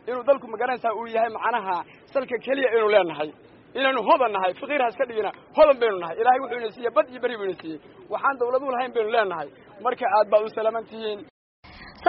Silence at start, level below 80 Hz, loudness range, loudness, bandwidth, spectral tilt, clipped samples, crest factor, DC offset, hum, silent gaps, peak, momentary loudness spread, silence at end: 0.05 s; -62 dBFS; 4 LU; -24 LUFS; 5.8 kHz; -1.5 dB/octave; under 0.1%; 18 dB; under 0.1%; none; 11.30-11.63 s; -6 dBFS; 13 LU; 0 s